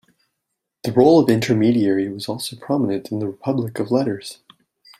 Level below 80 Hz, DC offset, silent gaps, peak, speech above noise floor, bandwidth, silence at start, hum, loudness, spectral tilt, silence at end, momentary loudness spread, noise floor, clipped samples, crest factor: -60 dBFS; under 0.1%; none; -2 dBFS; 60 dB; 15.5 kHz; 0.85 s; none; -19 LUFS; -6.5 dB/octave; 0.65 s; 13 LU; -79 dBFS; under 0.1%; 18 dB